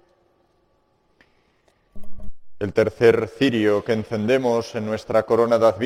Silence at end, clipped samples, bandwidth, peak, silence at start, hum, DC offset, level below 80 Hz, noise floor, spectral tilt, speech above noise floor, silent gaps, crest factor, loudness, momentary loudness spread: 0 s; under 0.1%; 14 kHz; -4 dBFS; 1.95 s; none; under 0.1%; -48 dBFS; -64 dBFS; -6.5 dB/octave; 45 dB; none; 18 dB; -20 LUFS; 8 LU